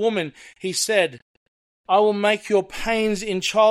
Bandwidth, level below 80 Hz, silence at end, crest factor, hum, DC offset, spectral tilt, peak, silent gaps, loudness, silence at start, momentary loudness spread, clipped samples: 15.5 kHz; -48 dBFS; 0 s; 16 dB; none; under 0.1%; -3 dB/octave; -6 dBFS; 1.22-1.84 s; -21 LUFS; 0 s; 9 LU; under 0.1%